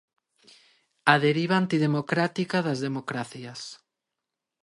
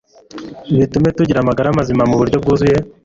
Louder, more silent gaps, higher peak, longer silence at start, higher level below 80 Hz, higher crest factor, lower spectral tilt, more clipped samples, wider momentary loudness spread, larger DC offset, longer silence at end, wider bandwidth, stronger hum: second, -25 LUFS vs -14 LUFS; neither; about the same, -4 dBFS vs -2 dBFS; first, 1.05 s vs 0.35 s; second, -72 dBFS vs -38 dBFS; first, 24 dB vs 12 dB; second, -6 dB/octave vs -8 dB/octave; neither; first, 17 LU vs 11 LU; neither; first, 0.9 s vs 0.15 s; first, 11.5 kHz vs 7.8 kHz; neither